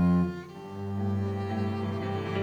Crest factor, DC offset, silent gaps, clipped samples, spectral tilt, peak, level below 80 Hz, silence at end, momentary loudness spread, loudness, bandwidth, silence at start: 14 dB; under 0.1%; none; under 0.1%; -8.5 dB/octave; -16 dBFS; -56 dBFS; 0 s; 11 LU; -31 LUFS; 7.4 kHz; 0 s